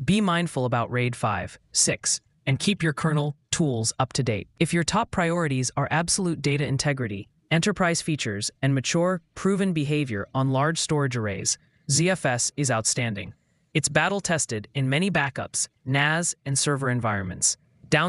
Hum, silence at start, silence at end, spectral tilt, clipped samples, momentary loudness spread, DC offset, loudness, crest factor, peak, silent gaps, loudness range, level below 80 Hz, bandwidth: none; 0 s; 0 s; -4 dB/octave; under 0.1%; 6 LU; under 0.1%; -24 LUFS; 20 dB; -6 dBFS; none; 1 LU; -54 dBFS; 12 kHz